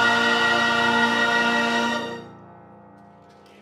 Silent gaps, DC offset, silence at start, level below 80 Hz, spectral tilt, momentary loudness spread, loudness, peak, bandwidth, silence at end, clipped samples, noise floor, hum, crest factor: none; under 0.1%; 0 s; -64 dBFS; -3 dB/octave; 10 LU; -20 LUFS; -8 dBFS; 16 kHz; 1.1 s; under 0.1%; -49 dBFS; none; 16 dB